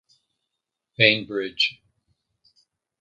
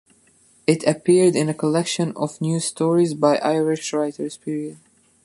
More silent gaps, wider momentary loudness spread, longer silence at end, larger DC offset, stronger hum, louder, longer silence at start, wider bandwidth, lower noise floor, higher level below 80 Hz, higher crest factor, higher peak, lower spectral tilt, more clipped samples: neither; about the same, 12 LU vs 12 LU; first, 1.3 s vs 0.5 s; neither; neither; about the same, -21 LUFS vs -21 LUFS; first, 1 s vs 0.7 s; second, 9 kHz vs 11.5 kHz; first, -83 dBFS vs -57 dBFS; about the same, -68 dBFS vs -68 dBFS; first, 28 dB vs 18 dB; about the same, 0 dBFS vs -2 dBFS; about the same, -4.5 dB/octave vs -5.5 dB/octave; neither